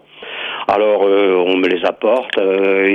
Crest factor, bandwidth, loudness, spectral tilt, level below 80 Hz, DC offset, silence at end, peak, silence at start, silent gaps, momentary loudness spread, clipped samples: 12 dB; 6.4 kHz; -15 LUFS; -6 dB/octave; -62 dBFS; under 0.1%; 0 s; -2 dBFS; 0.15 s; none; 9 LU; under 0.1%